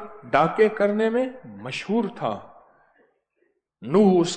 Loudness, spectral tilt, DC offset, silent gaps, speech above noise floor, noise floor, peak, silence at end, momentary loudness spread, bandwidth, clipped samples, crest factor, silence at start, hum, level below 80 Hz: -22 LUFS; -6 dB/octave; under 0.1%; none; 49 dB; -71 dBFS; -6 dBFS; 0 s; 15 LU; 9.4 kHz; under 0.1%; 18 dB; 0 s; none; -64 dBFS